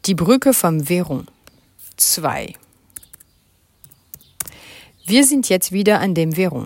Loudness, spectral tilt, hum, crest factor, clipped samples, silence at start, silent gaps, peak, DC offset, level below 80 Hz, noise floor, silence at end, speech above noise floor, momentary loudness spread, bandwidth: -16 LUFS; -4 dB/octave; none; 18 dB; under 0.1%; 0.05 s; none; 0 dBFS; under 0.1%; -54 dBFS; -58 dBFS; 0 s; 42 dB; 20 LU; 17 kHz